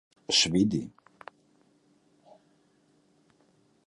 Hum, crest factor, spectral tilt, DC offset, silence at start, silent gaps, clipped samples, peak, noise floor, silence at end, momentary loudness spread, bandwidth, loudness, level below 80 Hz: none; 24 dB; -3.5 dB/octave; under 0.1%; 0.3 s; none; under 0.1%; -10 dBFS; -67 dBFS; 2.95 s; 28 LU; 11.5 kHz; -25 LUFS; -62 dBFS